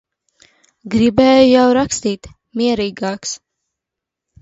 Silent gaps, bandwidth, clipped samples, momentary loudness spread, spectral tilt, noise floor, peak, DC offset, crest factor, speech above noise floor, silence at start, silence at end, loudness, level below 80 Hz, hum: none; 8 kHz; under 0.1%; 17 LU; -4.5 dB/octave; -83 dBFS; 0 dBFS; under 0.1%; 16 dB; 69 dB; 0.85 s; 1.05 s; -14 LUFS; -46 dBFS; none